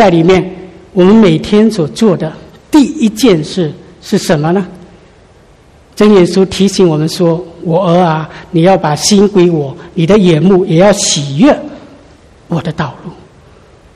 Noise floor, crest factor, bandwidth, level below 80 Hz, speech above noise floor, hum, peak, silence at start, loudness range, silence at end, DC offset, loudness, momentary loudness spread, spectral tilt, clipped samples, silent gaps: -41 dBFS; 10 dB; 14 kHz; -40 dBFS; 33 dB; none; 0 dBFS; 0 s; 4 LU; 0.8 s; under 0.1%; -10 LUFS; 12 LU; -5.5 dB/octave; 1%; none